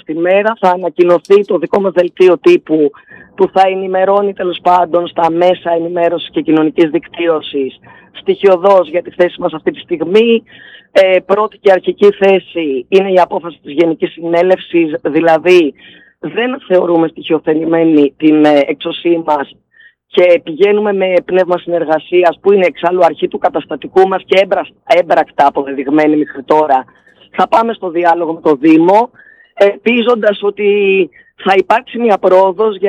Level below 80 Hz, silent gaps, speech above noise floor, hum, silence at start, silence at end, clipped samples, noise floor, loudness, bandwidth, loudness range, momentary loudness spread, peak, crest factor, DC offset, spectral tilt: -60 dBFS; none; 35 dB; none; 0.1 s; 0 s; under 0.1%; -46 dBFS; -11 LUFS; 8.6 kHz; 2 LU; 8 LU; 0 dBFS; 12 dB; under 0.1%; -6.5 dB/octave